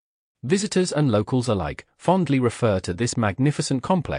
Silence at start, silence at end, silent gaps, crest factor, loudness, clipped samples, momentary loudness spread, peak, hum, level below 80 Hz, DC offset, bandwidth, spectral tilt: 0.45 s; 0 s; none; 16 dB; -23 LUFS; under 0.1%; 5 LU; -8 dBFS; none; -48 dBFS; under 0.1%; 10.5 kHz; -6 dB/octave